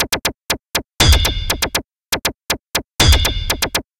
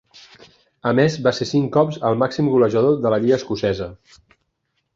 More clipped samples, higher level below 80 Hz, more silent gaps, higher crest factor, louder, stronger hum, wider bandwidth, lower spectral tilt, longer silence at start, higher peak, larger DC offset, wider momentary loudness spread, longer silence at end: neither; first, -22 dBFS vs -52 dBFS; neither; about the same, 18 dB vs 18 dB; about the same, -17 LUFS vs -19 LUFS; neither; first, 17.5 kHz vs 7.6 kHz; second, -2.5 dB/octave vs -7 dB/octave; second, 0 s vs 0.85 s; about the same, 0 dBFS vs -2 dBFS; neither; first, 11 LU vs 7 LU; second, 0.2 s vs 1 s